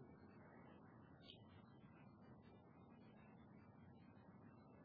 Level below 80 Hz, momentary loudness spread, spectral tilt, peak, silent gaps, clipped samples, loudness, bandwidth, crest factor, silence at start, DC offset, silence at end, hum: -84 dBFS; 3 LU; -5.5 dB/octave; -44 dBFS; none; under 0.1%; -65 LUFS; 4.8 kHz; 20 dB; 0 s; under 0.1%; 0 s; none